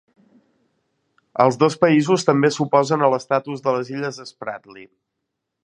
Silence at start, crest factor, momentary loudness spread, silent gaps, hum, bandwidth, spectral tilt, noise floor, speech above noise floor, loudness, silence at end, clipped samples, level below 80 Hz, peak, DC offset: 1.35 s; 20 dB; 15 LU; none; none; 11 kHz; -6 dB/octave; -79 dBFS; 60 dB; -19 LUFS; 0.8 s; under 0.1%; -68 dBFS; 0 dBFS; under 0.1%